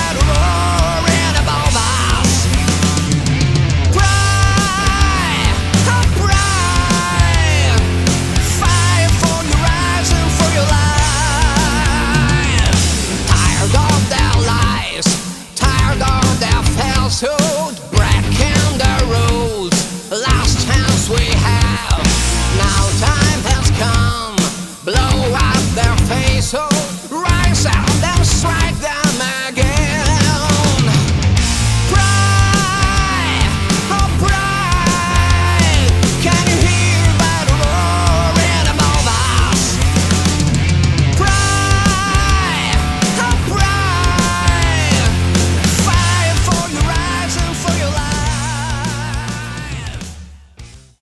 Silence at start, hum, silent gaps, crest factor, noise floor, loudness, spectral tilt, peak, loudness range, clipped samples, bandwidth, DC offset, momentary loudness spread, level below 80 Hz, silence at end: 0 s; none; none; 14 dB; -37 dBFS; -14 LUFS; -4 dB/octave; 0 dBFS; 2 LU; under 0.1%; 12 kHz; under 0.1%; 4 LU; -20 dBFS; 0.25 s